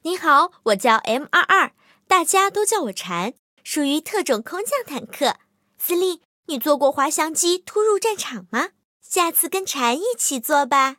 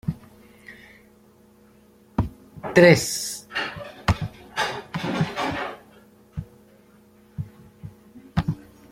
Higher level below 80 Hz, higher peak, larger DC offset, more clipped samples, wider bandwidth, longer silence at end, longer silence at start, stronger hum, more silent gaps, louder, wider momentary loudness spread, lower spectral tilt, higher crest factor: second, -78 dBFS vs -46 dBFS; about the same, 0 dBFS vs -2 dBFS; neither; neither; about the same, 17 kHz vs 16.5 kHz; second, 0.05 s vs 0.3 s; about the same, 0.05 s vs 0.05 s; second, none vs 60 Hz at -55 dBFS; first, 3.39-3.57 s, 6.25-6.43 s, 8.85-9.00 s vs none; first, -20 LUFS vs -23 LUFS; second, 10 LU vs 28 LU; second, -1.5 dB/octave vs -5 dB/octave; second, 20 dB vs 26 dB